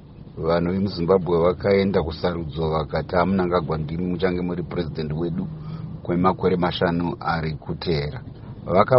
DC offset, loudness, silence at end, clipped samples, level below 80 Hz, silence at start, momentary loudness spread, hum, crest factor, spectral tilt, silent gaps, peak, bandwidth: under 0.1%; -23 LUFS; 0 s; under 0.1%; -42 dBFS; 0 s; 11 LU; none; 20 dB; -6 dB/octave; none; -2 dBFS; 5.8 kHz